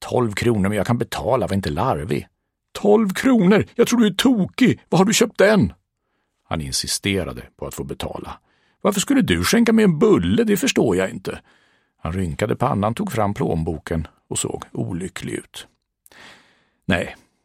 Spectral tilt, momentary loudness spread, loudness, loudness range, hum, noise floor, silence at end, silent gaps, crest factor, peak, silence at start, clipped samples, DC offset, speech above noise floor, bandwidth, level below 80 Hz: -5 dB/octave; 15 LU; -19 LUFS; 9 LU; none; -72 dBFS; 0.3 s; none; 20 dB; 0 dBFS; 0 s; under 0.1%; under 0.1%; 53 dB; 16 kHz; -44 dBFS